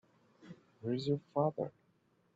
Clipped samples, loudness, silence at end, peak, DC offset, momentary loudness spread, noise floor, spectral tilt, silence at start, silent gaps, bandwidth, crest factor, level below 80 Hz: under 0.1%; -37 LUFS; 0.65 s; -18 dBFS; under 0.1%; 23 LU; -73 dBFS; -7.5 dB/octave; 0.45 s; none; 7.8 kHz; 22 dB; -78 dBFS